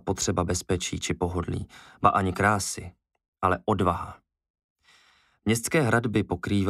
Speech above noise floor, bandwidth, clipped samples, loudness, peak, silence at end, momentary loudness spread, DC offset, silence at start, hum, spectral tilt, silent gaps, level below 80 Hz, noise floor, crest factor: 36 dB; 15.5 kHz; under 0.1%; -26 LUFS; -2 dBFS; 0 s; 11 LU; under 0.1%; 0.05 s; none; -5 dB/octave; 3.28-3.33 s, 4.50-4.54 s, 4.64-4.76 s; -48 dBFS; -62 dBFS; 24 dB